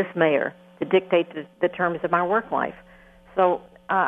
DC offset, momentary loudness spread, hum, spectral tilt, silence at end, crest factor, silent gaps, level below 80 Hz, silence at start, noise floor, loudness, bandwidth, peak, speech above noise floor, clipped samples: under 0.1%; 10 LU; none; -8 dB/octave; 0 s; 20 dB; none; -62 dBFS; 0 s; -50 dBFS; -24 LUFS; 3.9 kHz; -4 dBFS; 28 dB; under 0.1%